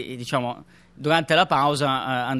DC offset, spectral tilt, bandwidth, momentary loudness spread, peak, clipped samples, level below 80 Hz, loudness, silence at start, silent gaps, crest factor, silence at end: under 0.1%; -5 dB/octave; 13 kHz; 12 LU; -4 dBFS; under 0.1%; -60 dBFS; -22 LUFS; 0 s; none; 20 dB; 0 s